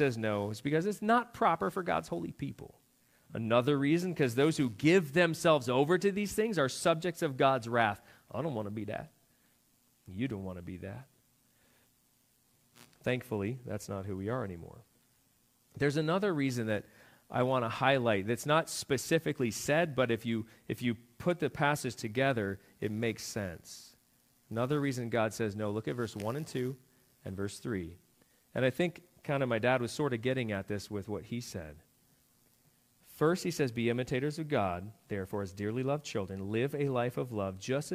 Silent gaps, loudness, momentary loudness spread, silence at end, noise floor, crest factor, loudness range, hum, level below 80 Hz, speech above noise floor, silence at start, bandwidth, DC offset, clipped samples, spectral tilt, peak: none; -33 LUFS; 13 LU; 0 s; -71 dBFS; 22 dB; 11 LU; none; -68 dBFS; 38 dB; 0 s; 15.5 kHz; under 0.1%; under 0.1%; -5.5 dB/octave; -12 dBFS